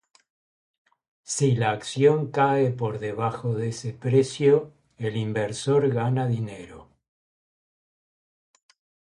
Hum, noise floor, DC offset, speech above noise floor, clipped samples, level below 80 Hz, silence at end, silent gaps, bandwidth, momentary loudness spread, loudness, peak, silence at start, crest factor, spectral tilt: none; under -90 dBFS; under 0.1%; over 67 dB; under 0.1%; -62 dBFS; 2.3 s; none; 11.5 kHz; 10 LU; -24 LUFS; -6 dBFS; 1.3 s; 18 dB; -6 dB/octave